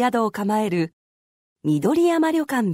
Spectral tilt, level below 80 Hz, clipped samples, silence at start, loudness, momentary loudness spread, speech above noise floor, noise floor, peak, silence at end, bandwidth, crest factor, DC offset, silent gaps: -6.5 dB/octave; -66 dBFS; under 0.1%; 0 s; -21 LUFS; 7 LU; over 70 dB; under -90 dBFS; -10 dBFS; 0 s; 16 kHz; 12 dB; under 0.1%; 0.93-1.56 s